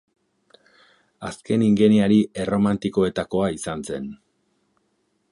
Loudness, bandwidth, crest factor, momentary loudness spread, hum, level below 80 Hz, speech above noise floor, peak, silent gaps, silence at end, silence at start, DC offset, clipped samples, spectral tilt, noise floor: -21 LUFS; 11.5 kHz; 18 dB; 18 LU; none; -54 dBFS; 49 dB; -4 dBFS; none; 1.15 s; 1.2 s; under 0.1%; under 0.1%; -6.5 dB/octave; -69 dBFS